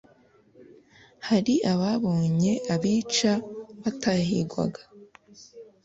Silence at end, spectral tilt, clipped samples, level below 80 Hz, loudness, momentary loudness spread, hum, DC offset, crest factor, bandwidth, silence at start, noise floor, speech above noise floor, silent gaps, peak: 0.2 s; -5.5 dB/octave; under 0.1%; -60 dBFS; -25 LUFS; 10 LU; none; under 0.1%; 16 dB; 8 kHz; 0.6 s; -59 dBFS; 35 dB; none; -10 dBFS